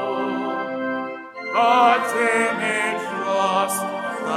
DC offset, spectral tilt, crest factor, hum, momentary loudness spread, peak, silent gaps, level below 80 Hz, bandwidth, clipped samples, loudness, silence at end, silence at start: under 0.1%; -3 dB/octave; 18 dB; none; 11 LU; -4 dBFS; none; -80 dBFS; 16 kHz; under 0.1%; -21 LUFS; 0 s; 0 s